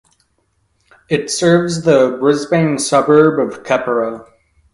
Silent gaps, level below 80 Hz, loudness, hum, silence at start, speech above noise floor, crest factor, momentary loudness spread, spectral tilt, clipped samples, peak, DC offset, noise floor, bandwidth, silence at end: none; -54 dBFS; -14 LUFS; none; 1.1 s; 49 dB; 14 dB; 9 LU; -5 dB/octave; under 0.1%; 0 dBFS; under 0.1%; -63 dBFS; 11.5 kHz; 0.5 s